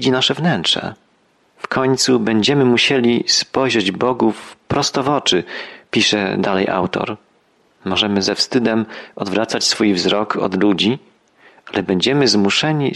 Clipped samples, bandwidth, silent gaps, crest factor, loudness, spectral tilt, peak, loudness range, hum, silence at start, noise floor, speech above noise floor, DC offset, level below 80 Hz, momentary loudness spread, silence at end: under 0.1%; 12.5 kHz; none; 14 dB; -16 LUFS; -4 dB/octave; -2 dBFS; 3 LU; none; 0 s; -58 dBFS; 42 dB; under 0.1%; -54 dBFS; 10 LU; 0 s